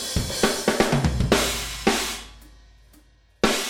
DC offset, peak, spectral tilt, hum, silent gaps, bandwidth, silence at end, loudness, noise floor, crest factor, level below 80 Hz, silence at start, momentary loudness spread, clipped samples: under 0.1%; -4 dBFS; -3.5 dB/octave; none; none; 18 kHz; 0 s; -23 LUFS; -55 dBFS; 22 dB; -36 dBFS; 0 s; 7 LU; under 0.1%